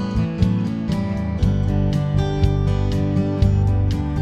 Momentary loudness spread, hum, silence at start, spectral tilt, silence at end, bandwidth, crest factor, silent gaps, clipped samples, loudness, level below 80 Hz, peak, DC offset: 4 LU; none; 0 s; -8.5 dB/octave; 0 s; 8 kHz; 16 dB; none; under 0.1%; -20 LUFS; -26 dBFS; -4 dBFS; under 0.1%